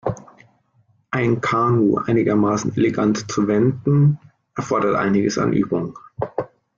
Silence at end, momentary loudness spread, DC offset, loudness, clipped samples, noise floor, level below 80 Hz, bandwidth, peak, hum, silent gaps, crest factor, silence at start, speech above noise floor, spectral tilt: 0.3 s; 13 LU; under 0.1%; -19 LUFS; under 0.1%; -61 dBFS; -52 dBFS; 7.4 kHz; -6 dBFS; none; none; 14 dB; 0.05 s; 43 dB; -7 dB/octave